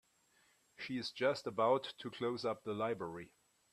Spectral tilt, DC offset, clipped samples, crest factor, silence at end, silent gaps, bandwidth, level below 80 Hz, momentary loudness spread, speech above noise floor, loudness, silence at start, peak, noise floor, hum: -5.5 dB/octave; under 0.1%; under 0.1%; 20 dB; 0.45 s; none; 13.5 kHz; -80 dBFS; 14 LU; 35 dB; -38 LUFS; 0.8 s; -20 dBFS; -73 dBFS; none